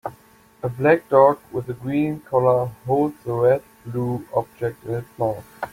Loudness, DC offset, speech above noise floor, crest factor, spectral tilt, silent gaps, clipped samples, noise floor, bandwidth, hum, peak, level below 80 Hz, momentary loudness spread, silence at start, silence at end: -22 LUFS; under 0.1%; 31 dB; 20 dB; -8.5 dB/octave; none; under 0.1%; -52 dBFS; 16.5 kHz; none; -2 dBFS; -56 dBFS; 14 LU; 0.05 s; 0.05 s